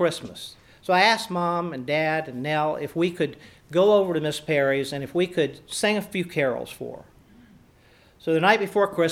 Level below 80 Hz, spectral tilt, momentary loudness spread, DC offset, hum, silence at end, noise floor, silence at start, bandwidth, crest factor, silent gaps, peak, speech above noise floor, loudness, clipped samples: -62 dBFS; -5 dB/octave; 16 LU; under 0.1%; none; 0 s; -56 dBFS; 0 s; 16 kHz; 22 dB; none; -2 dBFS; 32 dB; -23 LUFS; under 0.1%